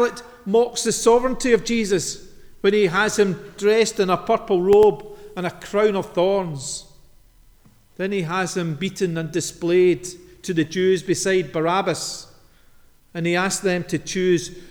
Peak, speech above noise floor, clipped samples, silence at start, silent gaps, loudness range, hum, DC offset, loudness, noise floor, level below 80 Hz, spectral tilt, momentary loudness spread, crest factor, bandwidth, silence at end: -4 dBFS; 32 dB; under 0.1%; 0 s; none; 6 LU; none; under 0.1%; -21 LUFS; -52 dBFS; -48 dBFS; -4.5 dB/octave; 12 LU; 18 dB; 19.5 kHz; 0 s